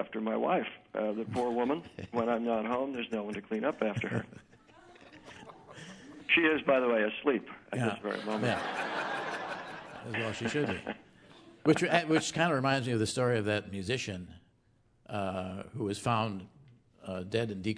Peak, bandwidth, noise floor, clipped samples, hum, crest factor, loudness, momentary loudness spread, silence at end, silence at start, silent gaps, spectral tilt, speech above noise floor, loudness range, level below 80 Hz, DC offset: -10 dBFS; 11 kHz; -68 dBFS; under 0.1%; none; 22 dB; -32 LUFS; 17 LU; 0 s; 0 s; none; -5 dB/octave; 36 dB; 6 LU; -68 dBFS; under 0.1%